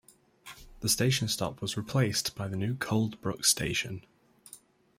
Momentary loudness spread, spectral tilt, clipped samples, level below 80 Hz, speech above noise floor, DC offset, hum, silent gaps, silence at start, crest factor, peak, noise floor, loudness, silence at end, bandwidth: 15 LU; -3.5 dB/octave; under 0.1%; -58 dBFS; 26 dB; under 0.1%; none; none; 0.45 s; 22 dB; -10 dBFS; -56 dBFS; -29 LUFS; 0.4 s; 16 kHz